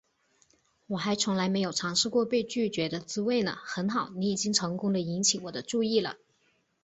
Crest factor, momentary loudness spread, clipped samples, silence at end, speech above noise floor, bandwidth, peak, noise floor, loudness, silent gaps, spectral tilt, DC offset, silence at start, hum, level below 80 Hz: 22 dB; 7 LU; under 0.1%; 0.65 s; 42 dB; 8.4 kHz; -8 dBFS; -71 dBFS; -29 LUFS; none; -3.5 dB/octave; under 0.1%; 0.9 s; none; -68 dBFS